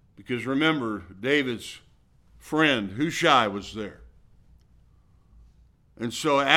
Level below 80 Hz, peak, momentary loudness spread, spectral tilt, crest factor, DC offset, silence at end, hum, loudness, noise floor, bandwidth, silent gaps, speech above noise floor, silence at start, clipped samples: -58 dBFS; -2 dBFS; 16 LU; -4 dB/octave; 26 dB; under 0.1%; 0 s; none; -25 LUFS; -58 dBFS; 16 kHz; none; 33 dB; 0.2 s; under 0.1%